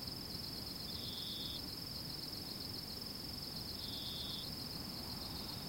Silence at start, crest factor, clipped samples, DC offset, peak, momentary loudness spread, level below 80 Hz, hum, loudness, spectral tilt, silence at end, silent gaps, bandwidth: 0 s; 14 dB; under 0.1%; under 0.1%; -30 dBFS; 2 LU; -60 dBFS; none; -43 LUFS; -3.5 dB/octave; 0 s; none; 16.5 kHz